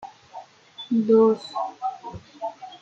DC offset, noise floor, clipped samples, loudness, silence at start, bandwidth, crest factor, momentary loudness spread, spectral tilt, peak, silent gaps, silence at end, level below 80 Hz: under 0.1%; -44 dBFS; under 0.1%; -23 LUFS; 0 s; 7.8 kHz; 16 dB; 25 LU; -7.5 dB/octave; -8 dBFS; none; 0.05 s; -64 dBFS